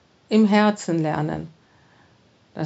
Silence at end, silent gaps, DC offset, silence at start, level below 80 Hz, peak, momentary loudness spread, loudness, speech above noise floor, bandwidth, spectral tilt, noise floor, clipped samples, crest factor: 0 s; none; under 0.1%; 0.3 s; -58 dBFS; -4 dBFS; 20 LU; -21 LUFS; 38 dB; 8 kHz; -6.5 dB/octave; -57 dBFS; under 0.1%; 18 dB